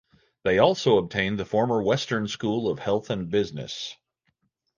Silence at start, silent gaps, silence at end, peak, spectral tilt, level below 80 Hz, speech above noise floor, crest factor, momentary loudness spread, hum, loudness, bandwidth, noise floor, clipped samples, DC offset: 0.45 s; none; 0.85 s; -4 dBFS; -5.5 dB/octave; -56 dBFS; 49 dB; 20 dB; 11 LU; none; -25 LUFS; 7.4 kHz; -73 dBFS; under 0.1%; under 0.1%